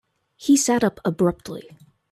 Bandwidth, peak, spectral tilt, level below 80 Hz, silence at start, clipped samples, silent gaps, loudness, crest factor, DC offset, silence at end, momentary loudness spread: 14.5 kHz; -8 dBFS; -4.5 dB/octave; -56 dBFS; 0.4 s; under 0.1%; none; -21 LUFS; 16 dB; under 0.1%; 0.5 s; 18 LU